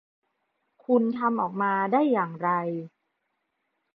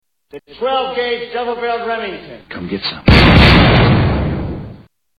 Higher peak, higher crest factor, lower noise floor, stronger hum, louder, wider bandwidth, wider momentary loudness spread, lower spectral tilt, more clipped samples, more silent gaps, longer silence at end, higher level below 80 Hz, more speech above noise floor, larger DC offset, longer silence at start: second, -10 dBFS vs 0 dBFS; about the same, 18 dB vs 14 dB; first, -78 dBFS vs -39 dBFS; neither; second, -25 LUFS vs -13 LUFS; second, 4.8 kHz vs 11.5 kHz; second, 9 LU vs 19 LU; first, -10.5 dB/octave vs -7.5 dB/octave; neither; neither; first, 1.05 s vs 0.4 s; second, -82 dBFS vs -22 dBFS; first, 53 dB vs 23 dB; neither; first, 0.9 s vs 0.35 s